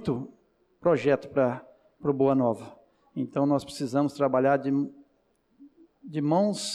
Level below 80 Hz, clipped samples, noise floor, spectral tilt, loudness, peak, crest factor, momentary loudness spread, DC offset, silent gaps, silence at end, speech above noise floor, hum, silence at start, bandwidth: -66 dBFS; under 0.1%; -69 dBFS; -6.5 dB/octave; -27 LUFS; -12 dBFS; 16 dB; 13 LU; under 0.1%; none; 0 s; 43 dB; none; 0 s; 12.5 kHz